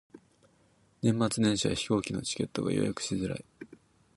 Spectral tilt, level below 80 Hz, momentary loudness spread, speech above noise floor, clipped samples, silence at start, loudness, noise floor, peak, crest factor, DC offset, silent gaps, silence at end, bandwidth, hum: -5 dB/octave; -58 dBFS; 15 LU; 36 dB; under 0.1%; 0.15 s; -30 LUFS; -66 dBFS; -14 dBFS; 18 dB; under 0.1%; none; 0.4 s; 11.5 kHz; none